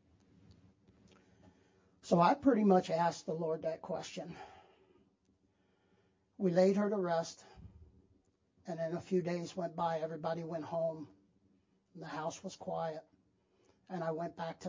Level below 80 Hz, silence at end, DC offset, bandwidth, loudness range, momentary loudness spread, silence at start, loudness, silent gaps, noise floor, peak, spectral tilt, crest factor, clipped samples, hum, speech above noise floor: -72 dBFS; 0 s; under 0.1%; 7.6 kHz; 10 LU; 20 LU; 0.5 s; -35 LUFS; none; -75 dBFS; -14 dBFS; -6.5 dB/octave; 22 dB; under 0.1%; none; 40 dB